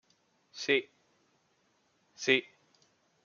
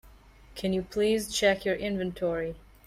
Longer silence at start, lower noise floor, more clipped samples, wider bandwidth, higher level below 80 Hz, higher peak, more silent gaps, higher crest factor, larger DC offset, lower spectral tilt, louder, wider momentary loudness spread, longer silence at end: first, 0.55 s vs 0.05 s; first, -73 dBFS vs -53 dBFS; neither; second, 7.2 kHz vs 15.5 kHz; second, -86 dBFS vs -52 dBFS; about the same, -10 dBFS vs -10 dBFS; neither; first, 28 dB vs 18 dB; neither; second, -2.5 dB/octave vs -4.5 dB/octave; about the same, -30 LUFS vs -29 LUFS; about the same, 11 LU vs 9 LU; first, 0.85 s vs 0.25 s